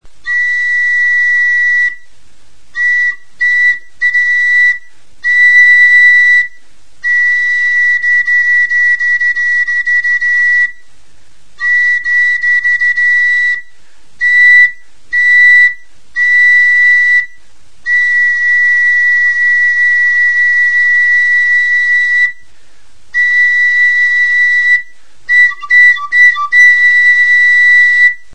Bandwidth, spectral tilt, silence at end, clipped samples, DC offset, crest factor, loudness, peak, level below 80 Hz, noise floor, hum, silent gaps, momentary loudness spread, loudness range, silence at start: 8.6 kHz; 2 dB/octave; 0.2 s; under 0.1%; 4%; 10 dB; -7 LUFS; 0 dBFS; -54 dBFS; -48 dBFS; none; none; 9 LU; 4 LU; 0 s